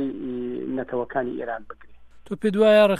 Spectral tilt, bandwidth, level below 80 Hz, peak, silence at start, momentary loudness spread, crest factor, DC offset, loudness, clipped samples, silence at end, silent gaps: -6.5 dB/octave; 13 kHz; -56 dBFS; -6 dBFS; 0 s; 17 LU; 16 dB; under 0.1%; -24 LUFS; under 0.1%; 0 s; none